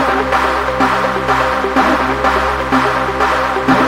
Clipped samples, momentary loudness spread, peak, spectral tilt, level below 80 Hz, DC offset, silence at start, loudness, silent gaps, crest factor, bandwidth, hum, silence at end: under 0.1%; 2 LU; 0 dBFS; -5 dB/octave; -32 dBFS; under 0.1%; 0 s; -14 LUFS; none; 14 dB; 16.5 kHz; none; 0 s